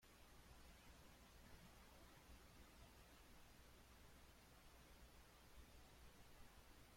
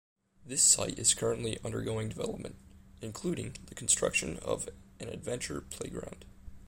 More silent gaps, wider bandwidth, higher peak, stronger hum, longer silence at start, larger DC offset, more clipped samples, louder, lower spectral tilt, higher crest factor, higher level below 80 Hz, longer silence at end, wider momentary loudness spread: neither; about the same, 16.5 kHz vs 16 kHz; second, -50 dBFS vs -10 dBFS; first, 60 Hz at -75 dBFS vs none; second, 0 s vs 0.4 s; neither; neither; second, -67 LUFS vs -31 LUFS; about the same, -3.5 dB/octave vs -2.5 dB/octave; second, 16 dB vs 24 dB; second, -70 dBFS vs -54 dBFS; about the same, 0 s vs 0 s; second, 2 LU vs 19 LU